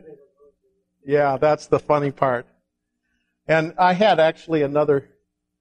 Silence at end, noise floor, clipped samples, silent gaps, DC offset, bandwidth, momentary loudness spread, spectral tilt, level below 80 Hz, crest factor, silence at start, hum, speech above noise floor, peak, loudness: 0.6 s; -76 dBFS; under 0.1%; none; under 0.1%; 9 kHz; 7 LU; -6.5 dB/octave; -58 dBFS; 20 dB; 0.05 s; none; 57 dB; -2 dBFS; -20 LUFS